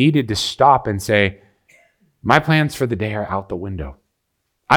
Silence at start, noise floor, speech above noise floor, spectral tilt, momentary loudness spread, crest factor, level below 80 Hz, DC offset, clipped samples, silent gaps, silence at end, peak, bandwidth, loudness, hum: 0 s; -73 dBFS; 55 dB; -5.5 dB/octave; 14 LU; 18 dB; -44 dBFS; under 0.1%; under 0.1%; none; 0 s; 0 dBFS; 18.5 kHz; -18 LUFS; none